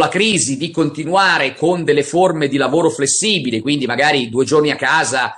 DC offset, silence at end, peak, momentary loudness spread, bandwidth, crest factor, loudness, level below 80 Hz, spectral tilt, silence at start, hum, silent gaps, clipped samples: under 0.1%; 0 s; -2 dBFS; 5 LU; 11.5 kHz; 14 dB; -15 LUFS; -58 dBFS; -3.5 dB/octave; 0 s; none; none; under 0.1%